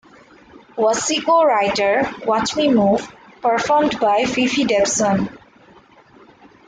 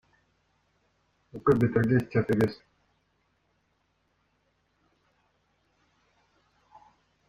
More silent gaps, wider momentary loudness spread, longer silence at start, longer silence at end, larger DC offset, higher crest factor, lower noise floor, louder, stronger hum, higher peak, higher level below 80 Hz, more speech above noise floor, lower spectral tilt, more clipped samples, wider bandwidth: neither; second, 7 LU vs 15 LU; second, 0.75 s vs 1.35 s; second, 1.3 s vs 4.75 s; neither; second, 14 dB vs 22 dB; second, -48 dBFS vs -73 dBFS; first, -17 LUFS vs -26 LUFS; neither; first, -4 dBFS vs -10 dBFS; first, -54 dBFS vs -60 dBFS; second, 32 dB vs 48 dB; second, -3.5 dB/octave vs -9 dB/octave; neither; second, 9.6 kHz vs 12.5 kHz